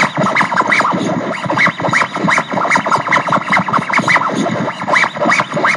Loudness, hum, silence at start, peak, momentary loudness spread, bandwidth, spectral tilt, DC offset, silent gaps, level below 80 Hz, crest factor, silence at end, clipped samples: -13 LUFS; none; 0 s; 0 dBFS; 5 LU; 11.5 kHz; -4.5 dB/octave; under 0.1%; none; -60 dBFS; 14 dB; 0 s; under 0.1%